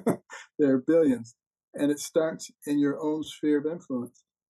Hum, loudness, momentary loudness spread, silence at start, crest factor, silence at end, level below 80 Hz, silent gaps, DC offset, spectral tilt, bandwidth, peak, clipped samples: none; -27 LUFS; 16 LU; 0 s; 14 dB; 0.4 s; -76 dBFS; 1.47-1.51 s, 1.63-1.73 s; under 0.1%; -5.5 dB/octave; 12.5 kHz; -12 dBFS; under 0.1%